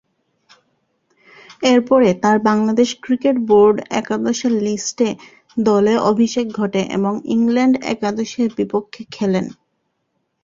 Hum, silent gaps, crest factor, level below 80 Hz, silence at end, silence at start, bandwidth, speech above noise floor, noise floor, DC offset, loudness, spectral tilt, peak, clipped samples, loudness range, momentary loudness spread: none; none; 16 dB; -58 dBFS; 0.9 s; 1.6 s; 7.6 kHz; 54 dB; -70 dBFS; under 0.1%; -17 LUFS; -5.5 dB/octave; -2 dBFS; under 0.1%; 4 LU; 8 LU